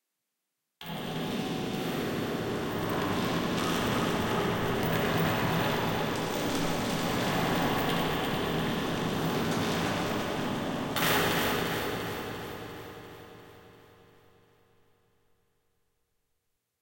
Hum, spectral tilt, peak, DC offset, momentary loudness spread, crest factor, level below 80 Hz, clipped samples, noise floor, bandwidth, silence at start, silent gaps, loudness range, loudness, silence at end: none; -4.5 dB/octave; -14 dBFS; under 0.1%; 10 LU; 18 dB; -52 dBFS; under 0.1%; -84 dBFS; 17 kHz; 0.8 s; none; 6 LU; -30 LUFS; 3.05 s